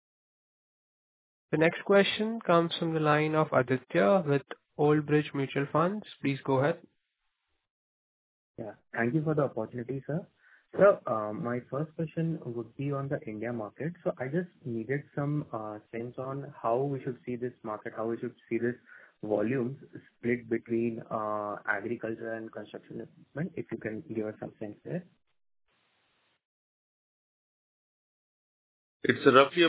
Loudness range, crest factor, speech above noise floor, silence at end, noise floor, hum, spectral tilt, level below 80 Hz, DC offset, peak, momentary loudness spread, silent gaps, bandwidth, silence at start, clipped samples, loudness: 12 LU; 26 dB; 51 dB; 0 s; -81 dBFS; none; -5 dB/octave; -72 dBFS; under 0.1%; -6 dBFS; 15 LU; 7.70-8.54 s, 26.45-29.00 s; 4 kHz; 1.5 s; under 0.1%; -31 LUFS